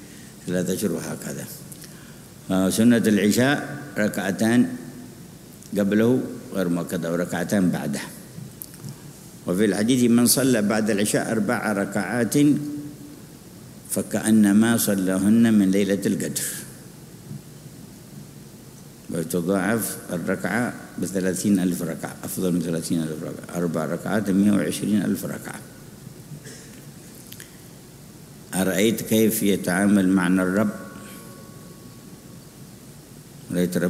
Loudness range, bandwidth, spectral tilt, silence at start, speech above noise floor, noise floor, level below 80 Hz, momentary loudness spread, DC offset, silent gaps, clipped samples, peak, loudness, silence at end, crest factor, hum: 8 LU; 16 kHz; -5 dB/octave; 0 s; 23 dB; -44 dBFS; -58 dBFS; 24 LU; under 0.1%; none; under 0.1%; -6 dBFS; -22 LUFS; 0 s; 18 dB; none